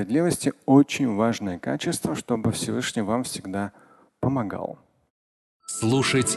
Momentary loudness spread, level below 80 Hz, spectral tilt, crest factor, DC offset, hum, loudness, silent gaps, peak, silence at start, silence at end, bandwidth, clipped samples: 12 LU; -54 dBFS; -5 dB/octave; 20 dB; under 0.1%; none; -25 LUFS; 5.10-5.60 s; -4 dBFS; 0 s; 0 s; 12.5 kHz; under 0.1%